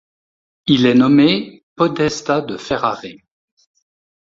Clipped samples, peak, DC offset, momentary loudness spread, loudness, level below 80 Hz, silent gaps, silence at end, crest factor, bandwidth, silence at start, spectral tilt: under 0.1%; 0 dBFS; under 0.1%; 16 LU; -16 LUFS; -52 dBFS; 1.63-1.76 s; 1.2 s; 16 dB; 7.6 kHz; 0.65 s; -5.5 dB/octave